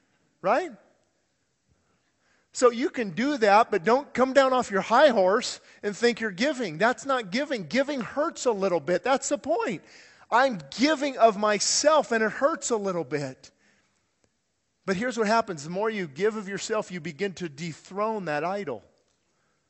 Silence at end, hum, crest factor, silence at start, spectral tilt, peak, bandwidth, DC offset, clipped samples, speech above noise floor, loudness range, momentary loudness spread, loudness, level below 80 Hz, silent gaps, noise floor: 0.9 s; none; 20 dB; 0.45 s; -3.5 dB/octave; -6 dBFS; 8.4 kHz; under 0.1%; under 0.1%; 51 dB; 8 LU; 12 LU; -25 LUFS; -68 dBFS; none; -76 dBFS